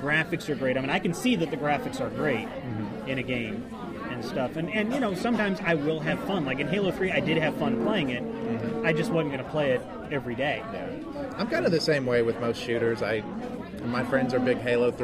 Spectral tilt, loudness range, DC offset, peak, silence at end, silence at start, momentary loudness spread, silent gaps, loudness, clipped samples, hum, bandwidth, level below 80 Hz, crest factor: -6 dB/octave; 3 LU; under 0.1%; -10 dBFS; 0 s; 0 s; 9 LU; none; -28 LUFS; under 0.1%; none; 15.5 kHz; -54 dBFS; 18 dB